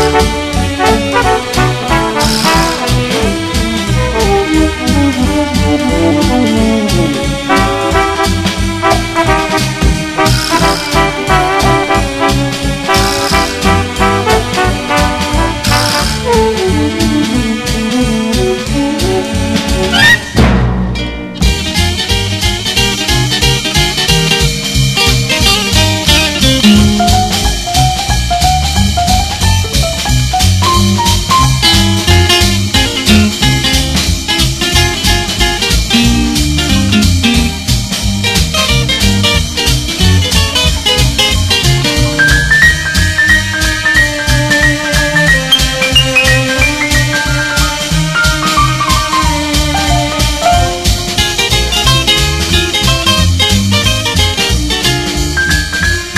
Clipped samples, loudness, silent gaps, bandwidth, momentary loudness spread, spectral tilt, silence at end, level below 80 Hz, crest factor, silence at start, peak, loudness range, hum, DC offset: 0.3%; -10 LUFS; none; 14.5 kHz; 5 LU; -3.5 dB/octave; 0 s; -18 dBFS; 10 dB; 0 s; 0 dBFS; 3 LU; none; under 0.1%